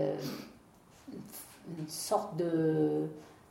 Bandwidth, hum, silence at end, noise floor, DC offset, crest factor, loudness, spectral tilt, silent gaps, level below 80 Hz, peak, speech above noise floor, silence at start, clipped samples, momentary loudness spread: 16.5 kHz; none; 0.15 s; -59 dBFS; under 0.1%; 18 dB; -33 LUFS; -6 dB/octave; none; -72 dBFS; -18 dBFS; 27 dB; 0 s; under 0.1%; 20 LU